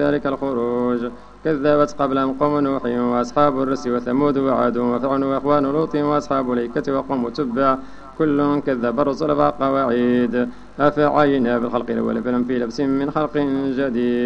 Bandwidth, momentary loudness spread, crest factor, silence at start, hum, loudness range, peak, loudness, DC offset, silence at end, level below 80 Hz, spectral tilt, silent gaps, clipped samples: 8 kHz; 5 LU; 16 dB; 0 s; none; 2 LU; -2 dBFS; -20 LUFS; under 0.1%; 0 s; -48 dBFS; -7.5 dB/octave; none; under 0.1%